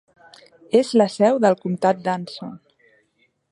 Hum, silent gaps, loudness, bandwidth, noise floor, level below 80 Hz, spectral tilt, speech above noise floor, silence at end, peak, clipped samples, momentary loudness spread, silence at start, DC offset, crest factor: none; none; -19 LUFS; 11.5 kHz; -66 dBFS; -72 dBFS; -6 dB/octave; 47 dB; 0.95 s; -2 dBFS; under 0.1%; 17 LU; 0.75 s; under 0.1%; 18 dB